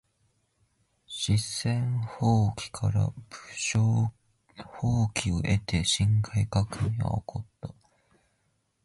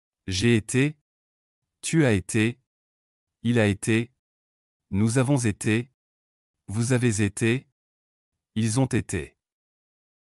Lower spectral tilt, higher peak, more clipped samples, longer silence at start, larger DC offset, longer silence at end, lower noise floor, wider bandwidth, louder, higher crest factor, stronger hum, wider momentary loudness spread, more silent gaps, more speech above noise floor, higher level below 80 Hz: about the same, -5 dB/octave vs -5.5 dB/octave; about the same, -10 dBFS vs -10 dBFS; neither; first, 1.1 s vs 0.25 s; neither; about the same, 1.15 s vs 1.1 s; second, -73 dBFS vs under -90 dBFS; about the same, 11.5 kHz vs 12 kHz; second, -28 LUFS vs -25 LUFS; about the same, 18 dB vs 16 dB; neither; first, 16 LU vs 11 LU; second, none vs 1.01-1.62 s, 2.67-3.27 s, 4.19-4.80 s, 5.94-6.54 s, 7.72-8.32 s; second, 47 dB vs over 67 dB; first, -46 dBFS vs -56 dBFS